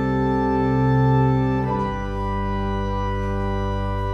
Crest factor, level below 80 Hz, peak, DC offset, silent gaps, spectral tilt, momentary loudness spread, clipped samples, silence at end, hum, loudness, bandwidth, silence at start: 12 dB; -30 dBFS; -8 dBFS; under 0.1%; none; -9 dB/octave; 7 LU; under 0.1%; 0 s; none; -22 LUFS; 6.2 kHz; 0 s